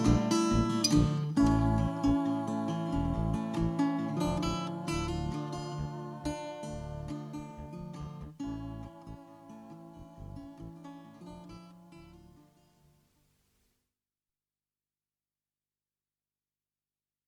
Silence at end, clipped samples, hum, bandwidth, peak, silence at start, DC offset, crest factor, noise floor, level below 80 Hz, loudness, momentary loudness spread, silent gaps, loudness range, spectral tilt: 5.05 s; under 0.1%; 50 Hz at -60 dBFS; 13.5 kHz; -14 dBFS; 0 s; under 0.1%; 20 dB; under -90 dBFS; -46 dBFS; -32 LUFS; 22 LU; none; 21 LU; -6 dB/octave